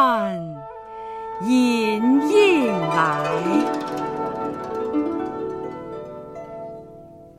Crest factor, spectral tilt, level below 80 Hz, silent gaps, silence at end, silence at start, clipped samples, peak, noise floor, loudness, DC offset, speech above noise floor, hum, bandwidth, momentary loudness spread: 18 dB; -5.5 dB/octave; -58 dBFS; none; 0.05 s; 0 s; under 0.1%; -4 dBFS; -43 dBFS; -21 LUFS; under 0.1%; 24 dB; none; 14 kHz; 19 LU